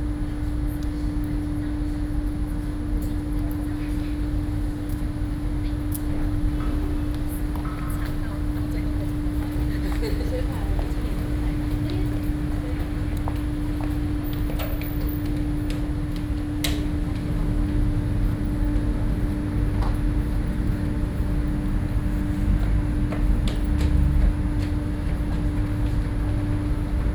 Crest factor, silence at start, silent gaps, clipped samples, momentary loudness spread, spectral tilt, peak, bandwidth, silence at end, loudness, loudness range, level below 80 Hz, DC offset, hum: 18 dB; 0 s; none; under 0.1%; 4 LU; -7.5 dB/octave; -6 dBFS; 19 kHz; 0 s; -27 LUFS; 4 LU; -26 dBFS; under 0.1%; none